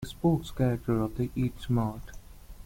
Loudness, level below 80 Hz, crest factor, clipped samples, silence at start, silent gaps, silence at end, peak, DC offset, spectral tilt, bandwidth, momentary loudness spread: -30 LUFS; -46 dBFS; 16 dB; under 0.1%; 0 s; none; 0 s; -14 dBFS; under 0.1%; -8 dB/octave; 16.5 kHz; 7 LU